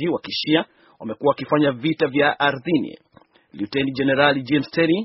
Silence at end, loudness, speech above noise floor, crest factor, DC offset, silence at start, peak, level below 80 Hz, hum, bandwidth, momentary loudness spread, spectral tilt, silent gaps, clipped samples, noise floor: 0 s; -20 LUFS; 34 dB; 20 dB; under 0.1%; 0 s; 0 dBFS; -60 dBFS; none; 6 kHz; 13 LU; -3.5 dB/octave; none; under 0.1%; -54 dBFS